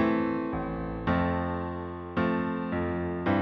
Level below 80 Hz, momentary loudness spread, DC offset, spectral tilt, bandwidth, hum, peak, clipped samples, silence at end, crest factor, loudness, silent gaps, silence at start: -46 dBFS; 6 LU; under 0.1%; -9.5 dB/octave; 5.8 kHz; none; -14 dBFS; under 0.1%; 0 s; 16 dB; -30 LUFS; none; 0 s